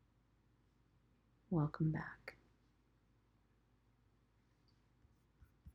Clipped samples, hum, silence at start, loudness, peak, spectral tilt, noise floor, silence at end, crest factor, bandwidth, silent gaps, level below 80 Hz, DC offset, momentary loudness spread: under 0.1%; none; 1.5 s; -41 LUFS; -26 dBFS; -8.5 dB/octave; -75 dBFS; 0.05 s; 22 dB; 5.8 kHz; none; -70 dBFS; under 0.1%; 18 LU